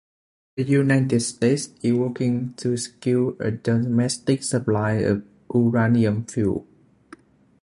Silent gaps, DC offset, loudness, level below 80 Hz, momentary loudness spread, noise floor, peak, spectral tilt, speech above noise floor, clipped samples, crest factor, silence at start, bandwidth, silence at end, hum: none; under 0.1%; -22 LUFS; -52 dBFS; 7 LU; -49 dBFS; -6 dBFS; -6 dB/octave; 28 dB; under 0.1%; 16 dB; 0.55 s; 11.5 kHz; 1 s; none